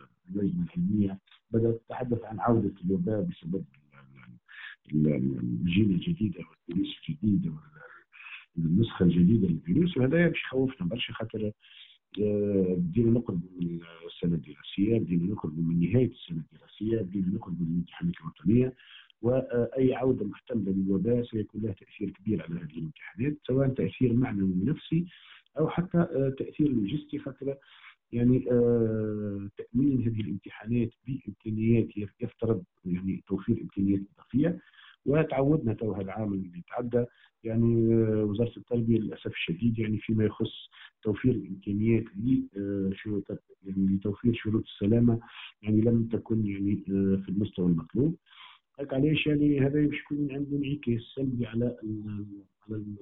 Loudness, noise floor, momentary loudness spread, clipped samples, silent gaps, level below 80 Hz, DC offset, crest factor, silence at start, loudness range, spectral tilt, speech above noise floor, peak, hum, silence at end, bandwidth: -29 LUFS; -53 dBFS; 13 LU; under 0.1%; none; -52 dBFS; under 0.1%; 18 dB; 0.3 s; 3 LU; -7.5 dB/octave; 25 dB; -12 dBFS; none; 0.05 s; 4 kHz